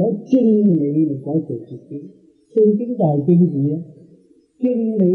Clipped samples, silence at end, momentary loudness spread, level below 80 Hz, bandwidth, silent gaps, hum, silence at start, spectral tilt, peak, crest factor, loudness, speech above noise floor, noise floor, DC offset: under 0.1%; 0 s; 15 LU; -68 dBFS; 3.4 kHz; none; none; 0 s; -12 dB/octave; -4 dBFS; 14 dB; -17 LUFS; 34 dB; -51 dBFS; under 0.1%